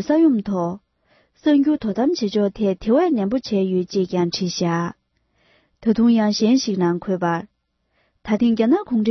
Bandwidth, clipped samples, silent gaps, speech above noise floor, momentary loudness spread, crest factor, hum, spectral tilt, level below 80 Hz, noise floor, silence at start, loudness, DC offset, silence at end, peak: 6.4 kHz; under 0.1%; none; 49 dB; 8 LU; 14 dB; none; -6 dB/octave; -54 dBFS; -68 dBFS; 0 s; -20 LUFS; under 0.1%; 0 s; -6 dBFS